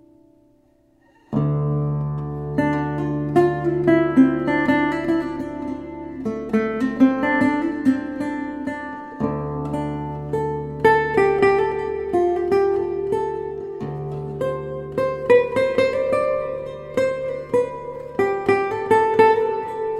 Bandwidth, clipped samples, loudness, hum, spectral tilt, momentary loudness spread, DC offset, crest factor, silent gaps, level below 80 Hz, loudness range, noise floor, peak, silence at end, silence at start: 11.5 kHz; under 0.1%; -21 LUFS; none; -8 dB/octave; 12 LU; under 0.1%; 18 dB; none; -48 dBFS; 4 LU; -58 dBFS; -2 dBFS; 0 s; 1.3 s